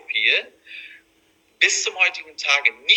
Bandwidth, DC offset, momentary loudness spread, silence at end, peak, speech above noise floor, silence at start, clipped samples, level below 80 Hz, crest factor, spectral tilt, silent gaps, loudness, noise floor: 11 kHz; under 0.1%; 20 LU; 0 s; 0 dBFS; 40 dB; 0.1 s; under 0.1%; -76 dBFS; 22 dB; 3.5 dB/octave; none; -18 LUFS; -61 dBFS